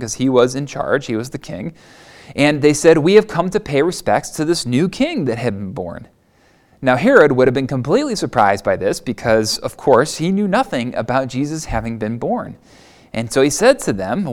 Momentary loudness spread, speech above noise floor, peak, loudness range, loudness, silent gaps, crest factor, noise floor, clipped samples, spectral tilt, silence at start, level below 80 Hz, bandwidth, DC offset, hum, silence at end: 14 LU; 38 dB; 0 dBFS; 4 LU; -16 LUFS; none; 16 dB; -54 dBFS; under 0.1%; -5 dB/octave; 0 s; -42 dBFS; 16.5 kHz; under 0.1%; none; 0 s